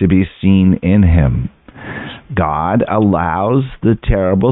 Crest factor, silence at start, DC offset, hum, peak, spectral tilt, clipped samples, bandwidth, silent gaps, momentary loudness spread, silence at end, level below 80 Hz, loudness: 12 dB; 0 s; under 0.1%; none; 0 dBFS; -13 dB/octave; under 0.1%; 4 kHz; none; 16 LU; 0 s; -26 dBFS; -14 LUFS